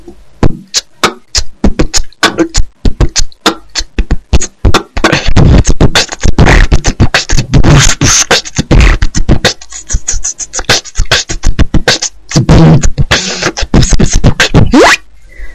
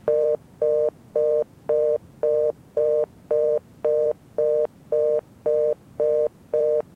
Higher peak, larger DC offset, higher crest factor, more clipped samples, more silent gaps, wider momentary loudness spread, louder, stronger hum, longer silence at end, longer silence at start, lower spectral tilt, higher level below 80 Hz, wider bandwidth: first, 0 dBFS vs -10 dBFS; first, 6% vs under 0.1%; about the same, 8 dB vs 12 dB; first, 6% vs under 0.1%; neither; first, 9 LU vs 3 LU; first, -9 LUFS vs -23 LUFS; neither; second, 0 s vs 0.15 s; about the same, 0 s vs 0.05 s; second, -4 dB/octave vs -7.5 dB/octave; first, -12 dBFS vs -62 dBFS; first, 13.5 kHz vs 3.6 kHz